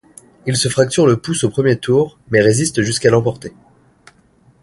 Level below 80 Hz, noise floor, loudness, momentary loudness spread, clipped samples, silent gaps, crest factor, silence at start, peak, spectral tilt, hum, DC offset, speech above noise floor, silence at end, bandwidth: -48 dBFS; -52 dBFS; -15 LUFS; 9 LU; under 0.1%; none; 16 dB; 0.45 s; 0 dBFS; -5 dB/octave; none; under 0.1%; 37 dB; 1.15 s; 11.5 kHz